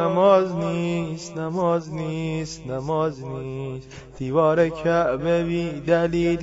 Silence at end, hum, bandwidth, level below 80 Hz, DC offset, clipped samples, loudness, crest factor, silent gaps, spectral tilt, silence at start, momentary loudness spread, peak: 0 s; none; 8 kHz; -48 dBFS; under 0.1%; under 0.1%; -23 LUFS; 18 dB; none; -7 dB/octave; 0 s; 13 LU; -4 dBFS